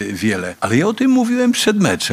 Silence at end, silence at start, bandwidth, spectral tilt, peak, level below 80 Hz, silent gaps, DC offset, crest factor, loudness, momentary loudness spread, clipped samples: 0 s; 0 s; 16 kHz; -4.5 dB/octave; 0 dBFS; -54 dBFS; none; under 0.1%; 16 dB; -16 LUFS; 5 LU; under 0.1%